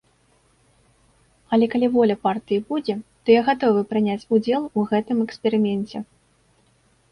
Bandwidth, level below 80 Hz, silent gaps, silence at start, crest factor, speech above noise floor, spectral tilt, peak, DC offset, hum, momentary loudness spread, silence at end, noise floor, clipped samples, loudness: 10.5 kHz; -62 dBFS; none; 1.5 s; 18 dB; 41 dB; -7.5 dB/octave; -4 dBFS; under 0.1%; none; 9 LU; 1.1 s; -61 dBFS; under 0.1%; -21 LUFS